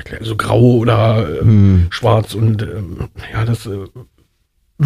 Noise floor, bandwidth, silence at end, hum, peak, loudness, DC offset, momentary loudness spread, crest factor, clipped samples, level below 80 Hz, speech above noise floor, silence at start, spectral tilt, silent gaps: -61 dBFS; 12.5 kHz; 0 s; none; 0 dBFS; -14 LUFS; under 0.1%; 16 LU; 14 dB; under 0.1%; -32 dBFS; 48 dB; 0.05 s; -8 dB/octave; none